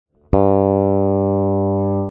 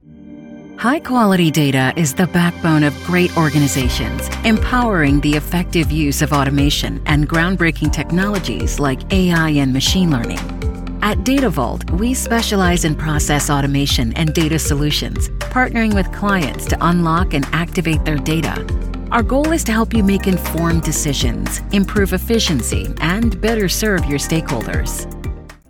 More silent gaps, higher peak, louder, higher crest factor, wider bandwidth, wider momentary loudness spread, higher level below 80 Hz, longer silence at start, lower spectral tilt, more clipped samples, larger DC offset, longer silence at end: neither; first, 0 dBFS vs -4 dBFS; about the same, -17 LUFS vs -16 LUFS; about the same, 16 dB vs 12 dB; second, 2.9 kHz vs 19 kHz; about the same, 4 LU vs 6 LU; second, -34 dBFS vs -24 dBFS; first, 0.3 s vs 0.1 s; first, -13.5 dB/octave vs -5 dB/octave; neither; neither; second, 0 s vs 0.15 s